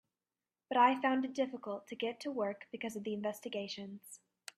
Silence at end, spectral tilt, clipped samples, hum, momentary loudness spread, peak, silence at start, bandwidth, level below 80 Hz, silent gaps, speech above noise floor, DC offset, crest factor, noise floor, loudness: 0.4 s; -4.5 dB/octave; under 0.1%; none; 17 LU; -14 dBFS; 0.7 s; 14.5 kHz; -86 dBFS; none; over 54 dB; under 0.1%; 22 dB; under -90 dBFS; -36 LUFS